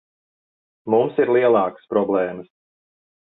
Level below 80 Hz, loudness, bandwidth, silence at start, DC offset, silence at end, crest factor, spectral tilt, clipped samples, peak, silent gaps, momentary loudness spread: -66 dBFS; -19 LUFS; 4 kHz; 0.85 s; under 0.1%; 0.8 s; 18 dB; -10.5 dB/octave; under 0.1%; -4 dBFS; none; 13 LU